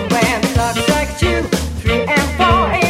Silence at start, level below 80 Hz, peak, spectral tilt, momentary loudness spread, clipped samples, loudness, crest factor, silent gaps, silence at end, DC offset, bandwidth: 0 s; -26 dBFS; 0 dBFS; -4.5 dB/octave; 5 LU; under 0.1%; -15 LUFS; 14 dB; none; 0 s; under 0.1%; 16.5 kHz